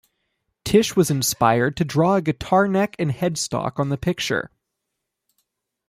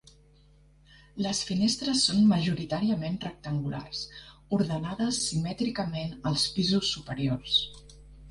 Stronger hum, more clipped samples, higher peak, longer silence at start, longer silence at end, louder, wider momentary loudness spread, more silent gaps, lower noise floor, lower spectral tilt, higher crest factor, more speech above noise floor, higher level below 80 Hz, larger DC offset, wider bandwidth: neither; neither; first, -2 dBFS vs -12 dBFS; second, 0.65 s vs 1.15 s; first, 1.4 s vs 0 s; first, -21 LUFS vs -28 LUFS; second, 6 LU vs 12 LU; neither; first, -80 dBFS vs -58 dBFS; about the same, -5 dB/octave vs -4.5 dB/octave; about the same, 18 dB vs 18 dB; first, 60 dB vs 30 dB; about the same, -50 dBFS vs -54 dBFS; neither; first, 15.5 kHz vs 11.5 kHz